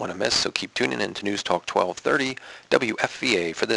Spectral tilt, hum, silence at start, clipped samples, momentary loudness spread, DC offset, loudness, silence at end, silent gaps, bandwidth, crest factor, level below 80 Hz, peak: -3 dB/octave; none; 0 s; under 0.1%; 5 LU; under 0.1%; -24 LUFS; 0 s; none; 11.5 kHz; 24 dB; -58 dBFS; -2 dBFS